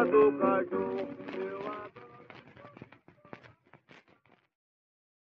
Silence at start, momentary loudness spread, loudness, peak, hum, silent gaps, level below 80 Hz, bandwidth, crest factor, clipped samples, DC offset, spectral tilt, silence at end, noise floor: 0 s; 28 LU; -31 LUFS; -12 dBFS; none; none; -74 dBFS; 5.2 kHz; 20 dB; under 0.1%; under 0.1%; -5.5 dB/octave; 1.8 s; -66 dBFS